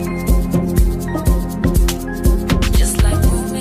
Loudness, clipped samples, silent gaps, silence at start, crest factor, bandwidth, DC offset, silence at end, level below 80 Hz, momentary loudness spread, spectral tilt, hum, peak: -17 LUFS; under 0.1%; none; 0 s; 14 dB; 15.5 kHz; under 0.1%; 0 s; -16 dBFS; 4 LU; -5.5 dB/octave; none; -2 dBFS